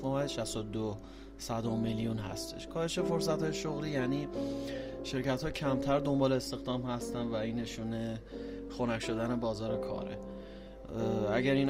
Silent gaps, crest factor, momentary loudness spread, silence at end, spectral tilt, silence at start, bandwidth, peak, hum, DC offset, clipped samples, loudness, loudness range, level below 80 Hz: none; 18 dB; 12 LU; 0 s; -6 dB/octave; 0 s; 16 kHz; -16 dBFS; none; under 0.1%; under 0.1%; -35 LUFS; 3 LU; -52 dBFS